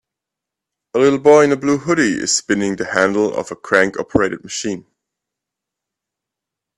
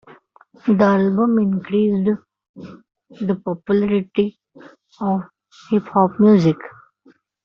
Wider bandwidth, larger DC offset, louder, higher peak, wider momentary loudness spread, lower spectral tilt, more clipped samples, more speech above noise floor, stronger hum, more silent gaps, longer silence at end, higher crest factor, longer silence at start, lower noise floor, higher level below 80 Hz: first, 11.5 kHz vs 6.4 kHz; neither; about the same, -16 LUFS vs -18 LUFS; about the same, 0 dBFS vs -2 dBFS; about the same, 13 LU vs 13 LU; second, -4 dB/octave vs -7.5 dB/octave; neither; first, 68 dB vs 38 dB; neither; second, none vs 2.49-2.54 s; first, 1.95 s vs 0.75 s; about the same, 18 dB vs 16 dB; first, 0.95 s vs 0.65 s; first, -84 dBFS vs -55 dBFS; first, -52 dBFS vs -58 dBFS